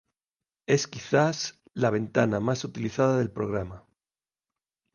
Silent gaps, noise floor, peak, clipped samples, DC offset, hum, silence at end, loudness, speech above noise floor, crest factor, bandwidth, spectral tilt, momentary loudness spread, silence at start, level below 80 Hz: none; under -90 dBFS; -8 dBFS; under 0.1%; under 0.1%; none; 1.15 s; -27 LUFS; over 64 dB; 20 dB; 10 kHz; -5.5 dB/octave; 9 LU; 0.7 s; -58 dBFS